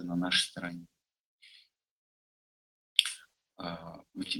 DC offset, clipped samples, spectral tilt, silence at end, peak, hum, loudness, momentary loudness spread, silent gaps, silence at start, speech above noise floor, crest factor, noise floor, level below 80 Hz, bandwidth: under 0.1%; under 0.1%; -2.5 dB/octave; 0 s; -4 dBFS; none; -31 LUFS; 19 LU; 1.20-1.39 s, 1.91-2.96 s; 0 s; 28 dB; 34 dB; -63 dBFS; -70 dBFS; 16.5 kHz